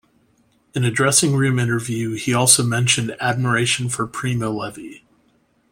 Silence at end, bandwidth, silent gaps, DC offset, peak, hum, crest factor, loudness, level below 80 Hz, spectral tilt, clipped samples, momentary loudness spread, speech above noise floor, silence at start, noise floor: 0.75 s; 16.5 kHz; none; under 0.1%; 0 dBFS; none; 20 dB; -18 LUFS; -54 dBFS; -3.5 dB/octave; under 0.1%; 13 LU; 42 dB; 0.75 s; -61 dBFS